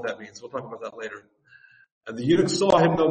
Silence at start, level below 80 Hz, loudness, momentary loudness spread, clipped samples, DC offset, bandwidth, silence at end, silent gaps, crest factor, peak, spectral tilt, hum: 0 s; -58 dBFS; -23 LUFS; 19 LU; under 0.1%; under 0.1%; 8.8 kHz; 0 s; 1.92-2.01 s; 20 dB; -4 dBFS; -5.5 dB/octave; none